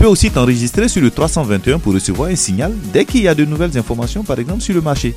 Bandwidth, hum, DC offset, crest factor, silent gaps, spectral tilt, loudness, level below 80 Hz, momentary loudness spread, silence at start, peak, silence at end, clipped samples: 16 kHz; none; under 0.1%; 14 dB; none; -5 dB/octave; -15 LUFS; -24 dBFS; 6 LU; 0 s; 0 dBFS; 0 s; under 0.1%